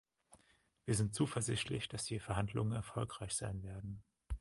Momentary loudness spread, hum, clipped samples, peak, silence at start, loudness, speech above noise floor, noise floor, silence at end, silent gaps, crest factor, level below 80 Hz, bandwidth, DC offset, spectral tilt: 13 LU; none; under 0.1%; -22 dBFS; 0.3 s; -40 LUFS; 34 dB; -73 dBFS; 0 s; none; 20 dB; -54 dBFS; 11.5 kHz; under 0.1%; -4.5 dB/octave